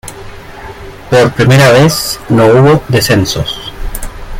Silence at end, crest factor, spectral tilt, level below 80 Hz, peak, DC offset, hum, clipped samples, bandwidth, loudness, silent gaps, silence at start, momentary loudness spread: 0 s; 10 dB; -5.5 dB/octave; -28 dBFS; 0 dBFS; under 0.1%; none; under 0.1%; 16.5 kHz; -8 LUFS; none; 0.05 s; 23 LU